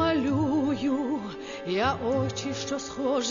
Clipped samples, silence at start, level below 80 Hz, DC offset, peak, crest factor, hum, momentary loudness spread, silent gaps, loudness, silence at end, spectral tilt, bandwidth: under 0.1%; 0 s; -54 dBFS; under 0.1%; -12 dBFS; 14 dB; none; 7 LU; none; -28 LUFS; 0 s; -5 dB/octave; 7.4 kHz